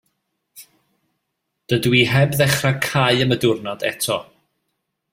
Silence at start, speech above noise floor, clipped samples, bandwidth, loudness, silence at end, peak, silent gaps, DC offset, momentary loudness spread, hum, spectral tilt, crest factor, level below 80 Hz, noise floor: 0.55 s; 58 dB; under 0.1%; 16.5 kHz; -18 LUFS; 0.9 s; -2 dBFS; none; under 0.1%; 8 LU; none; -4.5 dB/octave; 20 dB; -52 dBFS; -76 dBFS